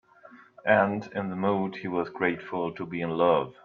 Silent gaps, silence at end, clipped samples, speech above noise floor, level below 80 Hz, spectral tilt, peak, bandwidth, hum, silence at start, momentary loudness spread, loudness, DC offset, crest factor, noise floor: none; 0.1 s; under 0.1%; 26 dB; -68 dBFS; -8 dB/octave; -8 dBFS; 6.6 kHz; none; 0.25 s; 9 LU; -27 LUFS; under 0.1%; 20 dB; -53 dBFS